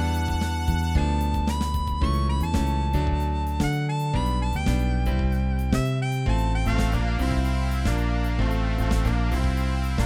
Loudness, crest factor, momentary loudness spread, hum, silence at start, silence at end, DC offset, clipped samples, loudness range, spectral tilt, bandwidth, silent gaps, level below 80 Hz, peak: -25 LUFS; 14 dB; 2 LU; none; 0 s; 0 s; under 0.1%; under 0.1%; 1 LU; -6.5 dB/octave; 16 kHz; none; -26 dBFS; -8 dBFS